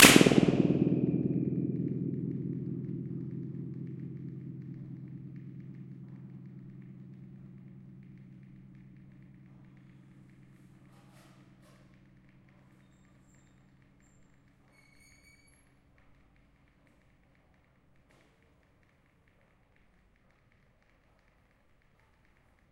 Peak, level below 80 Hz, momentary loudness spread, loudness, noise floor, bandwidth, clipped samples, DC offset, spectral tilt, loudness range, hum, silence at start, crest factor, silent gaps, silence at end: -2 dBFS; -64 dBFS; 27 LU; -30 LUFS; -67 dBFS; 15.5 kHz; under 0.1%; under 0.1%; -4 dB/octave; 27 LU; none; 0 s; 32 dB; none; 14.1 s